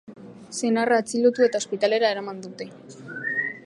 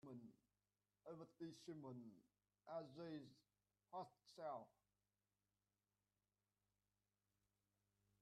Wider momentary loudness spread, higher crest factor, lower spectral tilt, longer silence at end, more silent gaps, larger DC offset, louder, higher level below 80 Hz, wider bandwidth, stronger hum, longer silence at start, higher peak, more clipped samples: first, 18 LU vs 10 LU; about the same, 18 dB vs 20 dB; second, -3.5 dB/octave vs -6.5 dB/octave; second, 0.05 s vs 3.55 s; neither; neither; first, -23 LUFS vs -58 LUFS; first, -76 dBFS vs under -90 dBFS; about the same, 11.5 kHz vs 10.5 kHz; second, none vs 50 Hz at -90 dBFS; about the same, 0.1 s vs 0.05 s; first, -8 dBFS vs -40 dBFS; neither